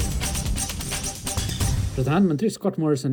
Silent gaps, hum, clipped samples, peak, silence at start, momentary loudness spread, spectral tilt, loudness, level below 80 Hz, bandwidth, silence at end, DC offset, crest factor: none; none; under 0.1%; -10 dBFS; 0 s; 6 LU; -5 dB/octave; -24 LUFS; -32 dBFS; 19.5 kHz; 0 s; under 0.1%; 14 dB